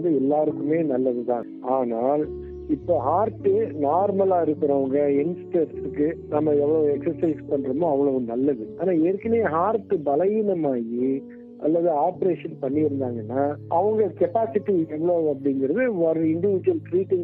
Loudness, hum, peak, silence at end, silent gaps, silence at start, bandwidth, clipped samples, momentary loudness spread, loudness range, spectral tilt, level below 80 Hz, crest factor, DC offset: -23 LUFS; none; -8 dBFS; 0 s; none; 0 s; 3.9 kHz; under 0.1%; 5 LU; 2 LU; -11.5 dB/octave; -54 dBFS; 14 dB; under 0.1%